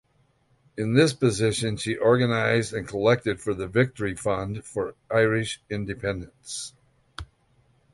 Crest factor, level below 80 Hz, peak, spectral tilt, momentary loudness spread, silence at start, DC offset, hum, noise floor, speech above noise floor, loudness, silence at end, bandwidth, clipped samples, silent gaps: 20 dB; -52 dBFS; -6 dBFS; -5.5 dB/octave; 14 LU; 0.75 s; under 0.1%; none; -65 dBFS; 41 dB; -25 LUFS; 0.7 s; 11.5 kHz; under 0.1%; none